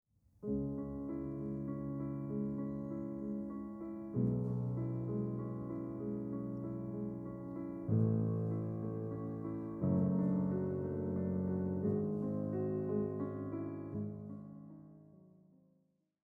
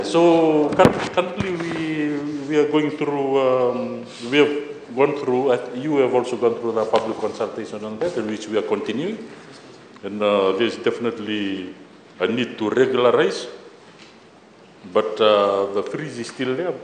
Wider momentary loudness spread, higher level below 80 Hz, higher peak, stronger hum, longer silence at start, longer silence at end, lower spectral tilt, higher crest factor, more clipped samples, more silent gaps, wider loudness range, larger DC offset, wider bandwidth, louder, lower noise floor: second, 10 LU vs 13 LU; about the same, -62 dBFS vs -58 dBFS; second, -20 dBFS vs 0 dBFS; neither; first, 0.4 s vs 0 s; first, 0.95 s vs 0 s; first, -13 dB/octave vs -5.5 dB/octave; about the same, 18 dB vs 20 dB; neither; neither; about the same, 5 LU vs 4 LU; neither; second, 2.5 kHz vs 9.6 kHz; second, -39 LUFS vs -21 LUFS; first, -76 dBFS vs -48 dBFS